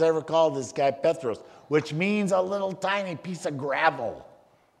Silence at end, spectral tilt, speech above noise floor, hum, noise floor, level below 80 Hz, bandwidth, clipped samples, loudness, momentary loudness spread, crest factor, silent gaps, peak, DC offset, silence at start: 0.55 s; -5.5 dB/octave; 32 dB; none; -58 dBFS; -70 dBFS; 12 kHz; under 0.1%; -26 LUFS; 10 LU; 20 dB; none; -6 dBFS; under 0.1%; 0 s